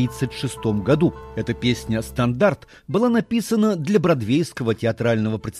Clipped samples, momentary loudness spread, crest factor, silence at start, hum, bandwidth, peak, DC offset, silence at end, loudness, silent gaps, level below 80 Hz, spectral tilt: under 0.1%; 7 LU; 18 dB; 0 s; none; 15 kHz; -4 dBFS; under 0.1%; 0 s; -21 LUFS; none; -46 dBFS; -6.5 dB/octave